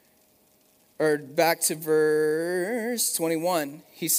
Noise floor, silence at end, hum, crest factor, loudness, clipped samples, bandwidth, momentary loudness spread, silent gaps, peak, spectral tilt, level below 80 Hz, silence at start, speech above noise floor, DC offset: -62 dBFS; 0 s; none; 18 dB; -25 LUFS; under 0.1%; 16 kHz; 6 LU; none; -8 dBFS; -3 dB/octave; -80 dBFS; 1 s; 37 dB; under 0.1%